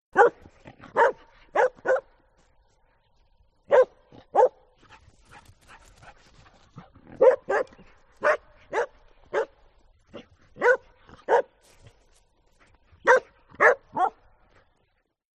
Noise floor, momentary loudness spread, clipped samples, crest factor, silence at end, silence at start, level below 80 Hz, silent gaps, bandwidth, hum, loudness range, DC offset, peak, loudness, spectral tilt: -72 dBFS; 11 LU; under 0.1%; 22 dB; 1.3 s; 0.15 s; -62 dBFS; none; 9 kHz; none; 4 LU; under 0.1%; -4 dBFS; -24 LUFS; -4 dB/octave